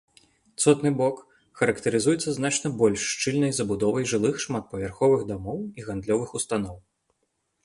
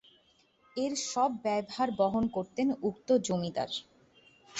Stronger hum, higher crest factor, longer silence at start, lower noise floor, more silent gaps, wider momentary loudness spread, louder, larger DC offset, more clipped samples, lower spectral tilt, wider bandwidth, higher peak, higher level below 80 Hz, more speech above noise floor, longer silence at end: neither; about the same, 20 dB vs 18 dB; second, 0.6 s vs 0.75 s; first, -75 dBFS vs -67 dBFS; neither; first, 11 LU vs 7 LU; first, -25 LUFS vs -31 LUFS; neither; neither; about the same, -4.5 dB/octave vs -4.5 dB/octave; first, 11.5 kHz vs 8.4 kHz; first, -6 dBFS vs -16 dBFS; first, -54 dBFS vs -66 dBFS; first, 51 dB vs 36 dB; first, 0.85 s vs 0 s